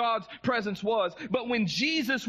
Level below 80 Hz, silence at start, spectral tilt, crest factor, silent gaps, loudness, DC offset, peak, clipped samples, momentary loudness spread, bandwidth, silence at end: -66 dBFS; 0 s; -4.5 dB/octave; 14 dB; none; -28 LUFS; under 0.1%; -14 dBFS; under 0.1%; 4 LU; 14 kHz; 0 s